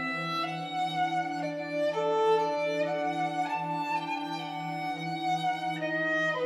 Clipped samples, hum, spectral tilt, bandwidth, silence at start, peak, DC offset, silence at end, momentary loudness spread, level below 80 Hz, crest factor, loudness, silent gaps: under 0.1%; none; -5 dB/octave; 14 kHz; 0 s; -16 dBFS; under 0.1%; 0 s; 7 LU; under -90 dBFS; 14 dB; -30 LUFS; none